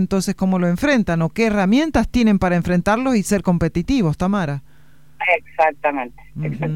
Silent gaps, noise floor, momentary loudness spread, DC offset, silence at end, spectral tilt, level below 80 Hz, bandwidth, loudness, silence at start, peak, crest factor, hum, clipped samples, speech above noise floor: none; -45 dBFS; 8 LU; 0.8%; 0 s; -6.5 dB/octave; -38 dBFS; 15.5 kHz; -18 LUFS; 0 s; -2 dBFS; 16 dB; none; under 0.1%; 27 dB